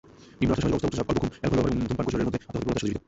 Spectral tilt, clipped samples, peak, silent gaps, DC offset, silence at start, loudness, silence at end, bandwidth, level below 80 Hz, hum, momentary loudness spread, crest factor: -7 dB/octave; under 0.1%; -10 dBFS; none; under 0.1%; 0.2 s; -27 LUFS; 0.1 s; 8.2 kHz; -42 dBFS; none; 4 LU; 16 dB